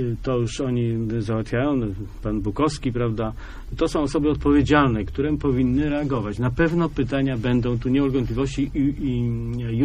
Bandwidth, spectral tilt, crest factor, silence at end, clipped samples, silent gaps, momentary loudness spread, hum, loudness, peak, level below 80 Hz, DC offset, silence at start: 10.5 kHz; -7.5 dB/octave; 20 dB; 0 s; under 0.1%; none; 7 LU; none; -23 LUFS; -2 dBFS; -34 dBFS; under 0.1%; 0 s